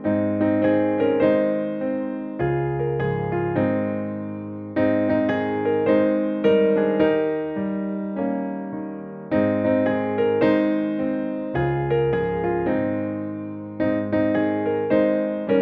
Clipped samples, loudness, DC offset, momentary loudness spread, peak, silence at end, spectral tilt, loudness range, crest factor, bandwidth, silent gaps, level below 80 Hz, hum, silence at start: under 0.1%; -22 LUFS; under 0.1%; 9 LU; -6 dBFS; 0 s; -10.5 dB/octave; 3 LU; 14 dB; 5 kHz; none; -50 dBFS; none; 0 s